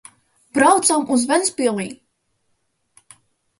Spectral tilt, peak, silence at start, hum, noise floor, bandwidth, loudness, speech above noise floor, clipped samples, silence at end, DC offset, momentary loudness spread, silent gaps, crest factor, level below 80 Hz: -2.5 dB/octave; 0 dBFS; 0.55 s; none; -69 dBFS; 11.5 kHz; -17 LUFS; 51 dB; under 0.1%; 1.65 s; under 0.1%; 12 LU; none; 20 dB; -66 dBFS